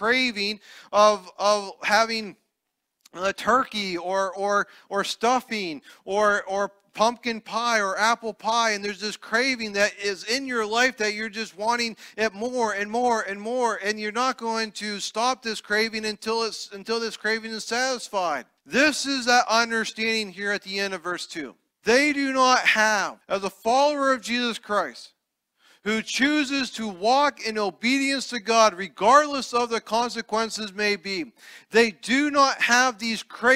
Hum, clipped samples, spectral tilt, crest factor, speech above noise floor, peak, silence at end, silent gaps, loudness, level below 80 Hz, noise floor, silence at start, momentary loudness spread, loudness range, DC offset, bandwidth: none; under 0.1%; -2 dB/octave; 20 dB; 57 dB; -4 dBFS; 0 s; none; -24 LUFS; -66 dBFS; -81 dBFS; 0 s; 10 LU; 4 LU; under 0.1%; 16 kHz